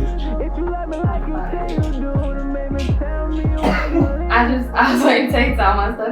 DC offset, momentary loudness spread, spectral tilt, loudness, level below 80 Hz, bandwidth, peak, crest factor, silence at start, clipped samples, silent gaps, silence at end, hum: under 0.1%; 9 LU; -6.5 dB/octave; -19 LUFS; -22 dBFS; 14.5 kHz; 0 dBFS; 16 dB; 0 s; under 0.1%; none; 0 s; none